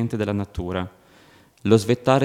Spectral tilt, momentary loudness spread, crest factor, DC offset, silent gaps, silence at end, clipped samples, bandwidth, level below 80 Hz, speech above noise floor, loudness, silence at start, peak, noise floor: -6.5 dB/octave; 12 LU; 20 dB; under 0.1%; none; 0 s; under 0.1%; 16 kHz; -46 dBFS; 32 dB; -23 LUFS; 0 s; -2 dBFS; -53 dBFS